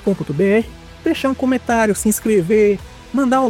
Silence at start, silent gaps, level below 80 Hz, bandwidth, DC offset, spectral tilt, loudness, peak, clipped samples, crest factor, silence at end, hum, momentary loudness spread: 0 s; none; -42 dBFS; 17 kHz; under 0.1%; -5.5 dB/octave; -17 LUFS; -4 dBFS; under 0.1%; 14 dB; 0 s; none; 9 LU